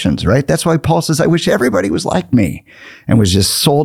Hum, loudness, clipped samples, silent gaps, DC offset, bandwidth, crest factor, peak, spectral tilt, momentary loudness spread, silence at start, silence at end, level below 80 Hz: none; -13 LUFS; under 0.1%; none; under 0.1%; 17.5 kHz; 12 dB; 0 dBFS; -5 dB/octave; 5 LU; 0 s; 0 s; -38 dBFS